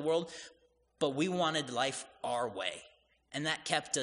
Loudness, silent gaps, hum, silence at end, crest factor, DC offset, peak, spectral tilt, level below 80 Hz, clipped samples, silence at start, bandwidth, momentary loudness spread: -35 LUFS; none; none; 0 s; 22 dB; under 0.1%; -14 dBFS; -3 dB/octave; -76 dBFS; under 0.1%; 0 s; 10.5 kHz; 13 LU